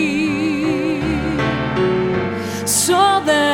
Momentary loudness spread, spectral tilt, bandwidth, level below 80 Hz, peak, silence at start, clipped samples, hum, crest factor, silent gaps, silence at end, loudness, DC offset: 6 LU; -4 dB/octave; 18 kHz; -38 dBFS; -2 dBFS; 0 s; under 0.1%; none; 16 dB; none; 0 s; -17 LUFS; under 0.1%